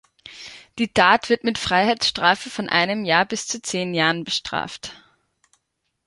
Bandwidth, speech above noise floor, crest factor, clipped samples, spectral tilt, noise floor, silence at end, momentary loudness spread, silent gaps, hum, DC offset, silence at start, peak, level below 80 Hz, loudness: 11.5 kHz; 54 dB; 22 dB; under 0.1%; -3 dB/octave; -75 dBFS; 1.1 s; 19 LU; none; none; under 0.1%; 0.25 s; -2 dBFS; -54 dBFS; -20 LUFS